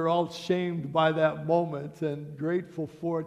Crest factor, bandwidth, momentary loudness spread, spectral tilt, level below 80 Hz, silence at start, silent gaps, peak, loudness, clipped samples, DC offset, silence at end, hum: 18 dB; 12.5 kHz; 9 LU; -7 dB/octave; -68 dBFS; 0 s; none; -10 dBFS; -29 LUFS; under 0.1%; under 0.1%; 0 s; none